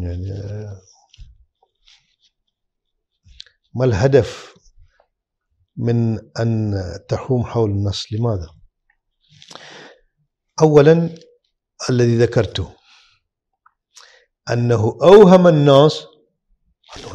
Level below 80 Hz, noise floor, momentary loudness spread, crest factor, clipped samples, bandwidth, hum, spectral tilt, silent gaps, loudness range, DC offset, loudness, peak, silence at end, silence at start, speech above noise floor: -46 dBFS; -75 dBFS; 22 LU; 18 dB; under 0.1%; 9.2 kHz; none; -7 dB/octave; none; 10 LU; under 0.1%; -15 LUFS; 0 dBFS; 0 s; 0 s; 60 dB